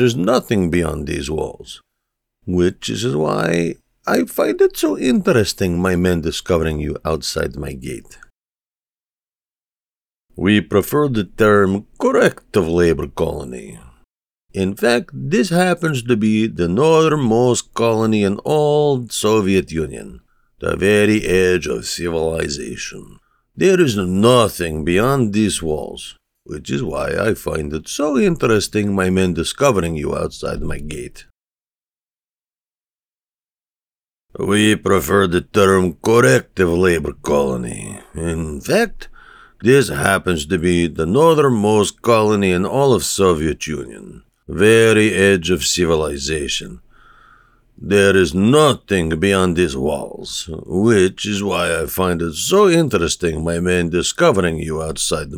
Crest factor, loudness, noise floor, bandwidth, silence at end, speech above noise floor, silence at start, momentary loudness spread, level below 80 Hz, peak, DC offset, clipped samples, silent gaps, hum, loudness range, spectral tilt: 16 dB; -17 LUFS; under -90 dBFS; over 20 kHz; 0 s; over 74 dB; 0 s; 12 LU; -40 dBFS; 0 dBFS; under 0.1%; under 0.1%; 32.03-32.07 s, 33.35-33.39 s, 33.70-33.74 s, 33.98-34.02 s; none; 6 LU; -5 dB/octave